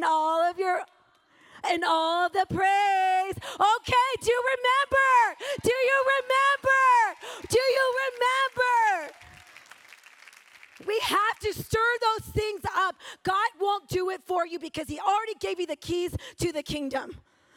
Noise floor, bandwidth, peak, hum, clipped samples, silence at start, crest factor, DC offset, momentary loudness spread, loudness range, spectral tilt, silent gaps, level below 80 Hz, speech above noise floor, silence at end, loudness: -62 dBFS; 17.5 kHz; -10 dBFS; none; under 0.1%; 0 s; 16 dB; under 0.1%; 11 LU; 7 LU; -3.5 dB/octave; none; -54 dBFS; 36 dB; 0.4 s; -25 LUFS